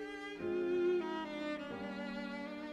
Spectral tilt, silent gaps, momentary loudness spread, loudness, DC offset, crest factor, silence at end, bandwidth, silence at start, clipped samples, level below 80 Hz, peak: -6 dB/octave; none; 9 LU; -39 LUFS; under 0.1%; 14 dB; 0 s; 9.4 kHz; 0 s; under 0.1%; -70 dBFS; -26 dBFS